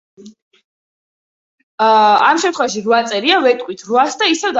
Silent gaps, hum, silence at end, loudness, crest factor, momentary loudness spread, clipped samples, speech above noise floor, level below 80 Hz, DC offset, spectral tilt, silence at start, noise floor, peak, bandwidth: 0.42-0.51 s, 0.64-1.78 s; none; 0 s; -13 LUFS; 16 dB; 7 LU; under 0.1%; over 76 dB; -66 dBFS; under 0.1%; -2.5 dB/octave; 0.25 s; under -90 dBFS; 0 dBFS; 8 kHz